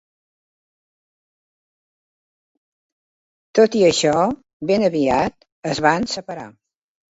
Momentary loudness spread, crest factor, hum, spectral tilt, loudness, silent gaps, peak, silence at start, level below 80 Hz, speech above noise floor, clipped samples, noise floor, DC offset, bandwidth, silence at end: 13 LU; 20 dB; none; -4.5 dB/octave; -18 LUFS; 4.53-4.60 s, 5.52-5.62 s; -2 dBFS; 3.55 s; -54 dBFS; over 72 dB; under 0.1%; under -90 dBFS; under 0.1%; 8 kHz; 0.6 s